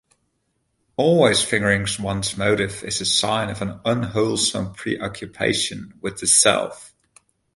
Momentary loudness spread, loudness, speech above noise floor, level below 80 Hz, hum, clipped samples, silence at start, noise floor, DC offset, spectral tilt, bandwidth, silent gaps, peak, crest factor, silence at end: 12 LU; -20 LUFS; 50 dB; -50 dBFS; none; under 0.1%; 1 s; -71 dBFS; under 0.1%; -3 dB/octave; 11.5 kHz; none; -2 dBFS; 20 dB; 0.7 s